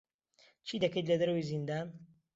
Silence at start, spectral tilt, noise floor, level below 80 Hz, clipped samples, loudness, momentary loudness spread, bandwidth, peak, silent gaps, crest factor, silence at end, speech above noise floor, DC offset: 0.65 s; -5.5 dB/octave; -68 dBFS; -72 dBFS; under 0.1%; -34 LUFS; 13 LU; 7.8 kHz; -18 dBFS; none; 18 dB; 0.3 s; 34 dB; under 0.1%